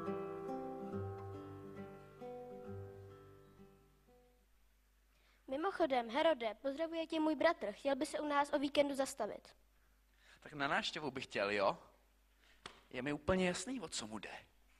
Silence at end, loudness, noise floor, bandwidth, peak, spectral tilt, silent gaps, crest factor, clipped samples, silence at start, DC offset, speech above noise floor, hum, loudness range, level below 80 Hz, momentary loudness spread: 0.35 s; -39 LUFS; -72 dBFS; 13.5 kHz; -20 dBFS; -4.5 dB/octave; none; 20 dB; under 0.1%; 0 s; under 0.1%; 34 dB; none; 17 LU; -68 dBFS; 19 LU